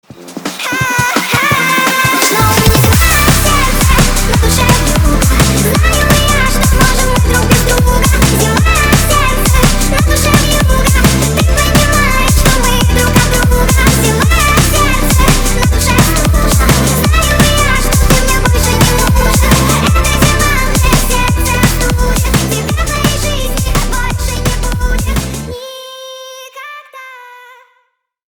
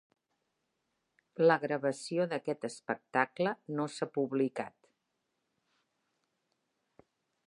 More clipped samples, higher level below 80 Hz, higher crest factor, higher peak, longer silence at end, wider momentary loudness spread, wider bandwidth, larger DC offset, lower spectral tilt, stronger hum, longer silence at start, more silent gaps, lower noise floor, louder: first, 0.2% vs under 0.1%; first, -14 dBFS vs -86 dBFS; second, 10 dB vs 24 dB; first, 0 dBFS vs -12 dBFS; second, 1 s vs 2.8 s; second, 7 LU vs 11 LU; first, over 20 kHz vs 11 kHz; neither; second, -4 dB/octave vs -5.5 dB/octave; neither; second, 0.2 s vs 1.4 s; neither; second, -59 dBFS vs -83 dBFS; first, -10 LUFS vs -33 LUFS